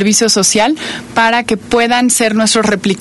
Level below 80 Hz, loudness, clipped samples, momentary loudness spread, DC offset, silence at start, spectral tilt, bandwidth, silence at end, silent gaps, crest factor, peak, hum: -44 dBFS; -11 LUFS; under 0.1%; 5 LU; under 0.1%; 0 s; -2.5 dB/octave; 12 kHz; 0 s; none; 12 dB; 0 dBFS; none